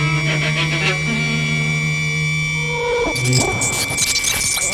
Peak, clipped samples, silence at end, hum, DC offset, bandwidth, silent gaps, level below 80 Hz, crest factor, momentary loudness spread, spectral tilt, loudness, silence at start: -4 dBFS; under 0.1%; 0 s; none; under 0.1%; 16 kHz; none; -40 dBFS; 14 dB; 3 LU; -3 dB/octave; -17 LUFS; 0 s